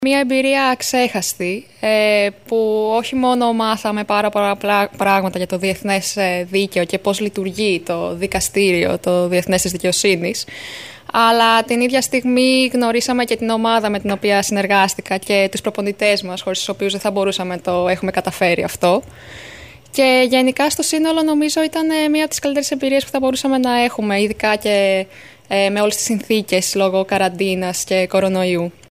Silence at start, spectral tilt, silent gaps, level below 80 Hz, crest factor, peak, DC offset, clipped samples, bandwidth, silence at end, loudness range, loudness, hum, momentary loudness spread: 0 s; -3.5 dB/octave; none; -50 dBFS; 14 dB; -2 dBFS; 0.2%; under 0.1%; 15.5 kHz; 0.2 s; 3 LU; -17 LUFS; none; 7 LU